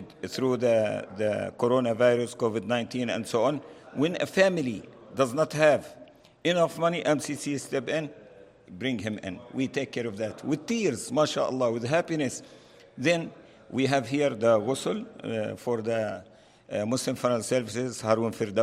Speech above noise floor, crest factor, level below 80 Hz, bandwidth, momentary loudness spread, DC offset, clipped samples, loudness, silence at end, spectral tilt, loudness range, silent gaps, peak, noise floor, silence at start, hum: 24 dB; 20 dB; -70 dBFS; 15.5 kHz; 11 LU; under 0.1%; under 0.1%; -28 LUFS; 0 s; -5 dB/octave; 4 LU; none; -8 dBFS; -51 dBFS; 0 s; none